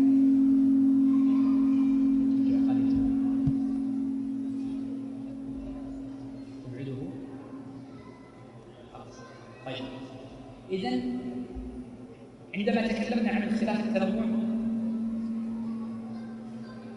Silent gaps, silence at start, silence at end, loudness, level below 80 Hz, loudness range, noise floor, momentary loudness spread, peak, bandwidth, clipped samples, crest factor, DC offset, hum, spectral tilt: none; 0 s; 0 s; -28 LUFS; -54 dBFS; 17 LU; -48 dBFS; 23 LU; -14 dBFS; 6.4 kHz; under 0.1%; 14 dB; under 0.1%; none; -7.5 dB/octave